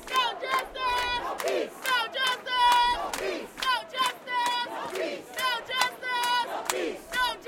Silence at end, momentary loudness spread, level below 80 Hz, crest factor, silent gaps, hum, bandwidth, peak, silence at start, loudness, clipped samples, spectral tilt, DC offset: 0 s; 8 LU; -56 dBFS; 22 dB; none; none; 17 kHz; -6 dBFS; 0 s; -27 LUFS; under 0.1%; -0.5 dB/octave; under 0.1%